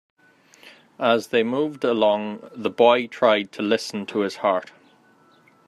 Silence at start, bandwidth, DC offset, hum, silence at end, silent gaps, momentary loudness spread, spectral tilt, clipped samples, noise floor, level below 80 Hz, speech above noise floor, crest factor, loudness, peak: 0.65 s; 13.5 kHz; under 0.1%; none; 1 s; none; 10 LU; -5 dB/octave; under 0.1%; -56 dBFS; -74 dBFS; 35 dB; 20 dB; -22 LUFS; -4 dBFS